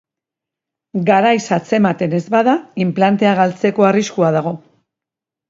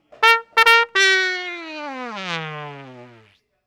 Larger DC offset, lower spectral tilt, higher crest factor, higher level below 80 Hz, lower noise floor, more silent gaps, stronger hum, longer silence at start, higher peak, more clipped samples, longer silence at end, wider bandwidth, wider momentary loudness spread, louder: neither; first, -6.5 dB/octave vs -1.5 dB/octave; about the same, 16 dB vs 20 dB; about the same, -62 dBFS vs -66 dBFS; first, -86 dBFS vs -55 dBFS; neither; neither; first, 0.95 s vs 0.2 s; about the same, 0 dBFS vs 0 dBFS; second, under 0.1% vs 0.2%; first, 0.9 s vs 0.6 s; second, 7.8 kHz vs over 20 kHz; second, 7 LU vs 18 LU; about the same, -15 LUFS vs -16 LUFS